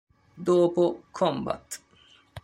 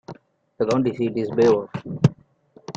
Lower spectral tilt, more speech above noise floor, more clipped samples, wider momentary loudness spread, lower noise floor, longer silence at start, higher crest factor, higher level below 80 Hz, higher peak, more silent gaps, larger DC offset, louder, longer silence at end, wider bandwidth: second, -6 dB/octave vs -8 dB/octave; about the same, 33 dB vs 34 dB; neither; first, 15 LU vs 10 LU; first, -59 dBFS vs -54 dBFS; first, 0.35 s vs 0.1 s; about the same, 16 dB vs 20 dB; second, -62 dBFS vs -56 dBFS; second, -10 dBFS vs -2 dBFS; neither; neither; second, -26 LUFS vs -22 LUFS; about the same, 0.05 s vs 0.05 s; first, 15 kHz vs 7.8 kHz